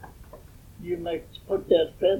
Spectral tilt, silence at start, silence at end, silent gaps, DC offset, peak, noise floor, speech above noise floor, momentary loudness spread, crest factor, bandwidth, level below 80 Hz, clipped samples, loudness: -6.5 dB/octave; 0 s; 0 s; none; under 0.1%; -8 dBFS; -47 dBFS; 22 dB; 25 LU; 18 dB; 18.5 kHz; -50 dBFS; under 0.1%; -27 LUFS